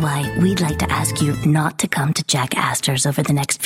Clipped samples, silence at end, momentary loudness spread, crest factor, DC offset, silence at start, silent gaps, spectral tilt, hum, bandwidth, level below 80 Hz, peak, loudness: under 0.1%; 0 s; 2 LU; 16 dB; under 0.1%; 0 s; none; -4.5 dB/octave; none; 16.5 kHz; -40 dBFS; -2 dBFS; -18 LUFS